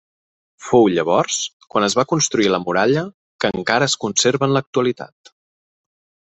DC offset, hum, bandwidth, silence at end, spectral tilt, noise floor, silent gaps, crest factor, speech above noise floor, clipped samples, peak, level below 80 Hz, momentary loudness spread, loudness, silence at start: under 0.1%; none; 8.4 kHz; 1.25 s; -3.5 dB/octave; under -90 dBFS; 1.53-1.60 s, 3.14-3.39 s, 4.67-4.73 s; 20 dB; over 72 dB; under 0.1%; 0 dBFS; -58 dBFS; 8 LU; -18 LUFS; 0.6 s